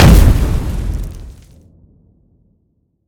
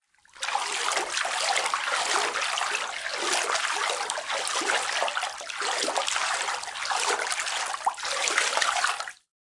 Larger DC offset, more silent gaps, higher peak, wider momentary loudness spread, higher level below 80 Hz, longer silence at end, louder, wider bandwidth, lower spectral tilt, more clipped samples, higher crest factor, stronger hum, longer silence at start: neither; neither; first, 0 dBFS vs -8 dBFS; first, 25 LU vs 6 LU; first, -16 dBFS vs -72 dBFS; first, 1.75 s vs 0.25 s; first, -14 LUFS vs -26 LUFS; first, 18.5 kHz vs 11.5 kHz; first, -6 dB/octave vs 2 dB/octave; first, 1% vs under 0.1%; second, 14 dB vs 20 dB; neither; second, 0 s vs 0.35 s